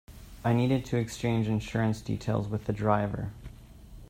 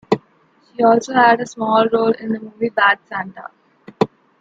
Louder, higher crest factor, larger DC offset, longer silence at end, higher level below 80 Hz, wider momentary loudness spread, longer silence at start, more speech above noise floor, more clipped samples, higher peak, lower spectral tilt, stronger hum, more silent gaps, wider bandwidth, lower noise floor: second, -30 LUFS vs -17 LUFS; about the same, 20 dB vs 16 dB; neither; second, 0.05 s vs 0.35 s; first, -50 dBFS vs -62 dBFS; second, 9 LU vs 14 LU; about the same, 0.1 s vs 0.1 s; second, 20 dB vs 39 dB; neither; second, -10 dBFS vs -2 dBFS; first, -7 dB/octave vs -5 dB/octave; neither; neither; first, 15.5 kHz vs 7.8 kHz; second, -48 dBFS vs -56 dBFS